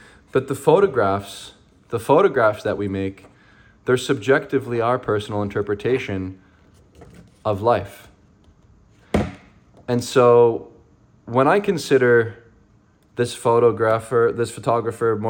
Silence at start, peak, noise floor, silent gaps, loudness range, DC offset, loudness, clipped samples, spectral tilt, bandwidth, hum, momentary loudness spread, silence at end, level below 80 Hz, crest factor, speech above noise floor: 0.35 s; -2 dBFS; -56 dBFS; none; 7 LU; under 0.1%; -20 LUFS; under 0.1%; -6 dB/octave; 17 kHz; none; 14 LU; 0 s; -50 dBFS; 18 dB; 37 dB